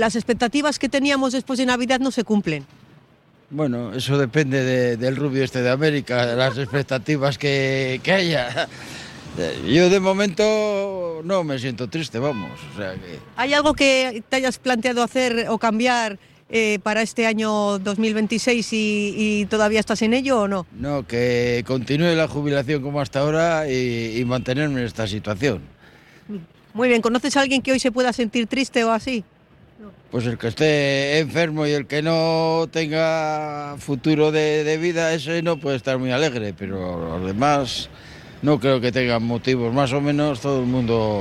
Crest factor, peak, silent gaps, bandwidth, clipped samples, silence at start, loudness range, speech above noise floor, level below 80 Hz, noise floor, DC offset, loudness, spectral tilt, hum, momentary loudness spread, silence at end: 16 dB; -4 dBFS; none; 13.5 kHz; under 0.1%; 0 s; 3 LU; 34 dB; -50 dBFS; -54 dBFS; under 0.1%; -21 LUFS; -5 dB/octave; none; 9 LU; 0 s